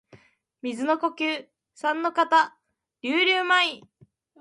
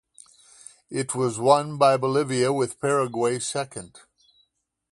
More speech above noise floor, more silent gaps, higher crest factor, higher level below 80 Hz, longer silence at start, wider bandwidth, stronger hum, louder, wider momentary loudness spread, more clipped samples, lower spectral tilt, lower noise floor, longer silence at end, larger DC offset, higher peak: second, 32 dB vs 47 dB; neither; about the same, 18 dB vs 22 dB; second, -78 dBFS vs -66 dBFS; second, 0.65 s vs 0.9 s; about the same, 11.5 kHz vs 11.5 kHz; neither; about the same, -24 LUFS vs -23 LUFS; first, 14 LU vs 11 LU; neither; second, -2.5 dB/octave vs -4.5 dB/octave; second, -56 dBFS vs -70 dBFS; second, 0.6 s vs 1.05 s; neither; second, -8 dBFS vs -4 dBFS